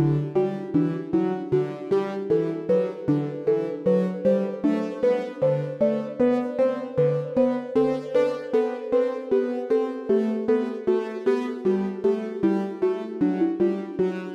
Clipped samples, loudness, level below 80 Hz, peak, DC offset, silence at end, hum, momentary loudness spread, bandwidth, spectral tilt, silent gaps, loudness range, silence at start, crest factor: under 0.1%; -24 LUFS; -64 dBFS; -10 dBFS; under 0.1%; 0 s; none; 2 LU; 8.6 kHz; -9 dB/octave; none; 1 LU; 0 s; 14 dB